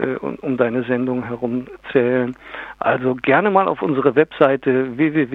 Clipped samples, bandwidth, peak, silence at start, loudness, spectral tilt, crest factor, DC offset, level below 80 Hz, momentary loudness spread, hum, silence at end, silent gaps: under 0.1%; 4.2 kHz; 0 dBFS; 0 s; -19 LUFS; -9 dB/octave; 18 dB; under 0.1%; -56 dBFS; 9 LU; none; 0 s; none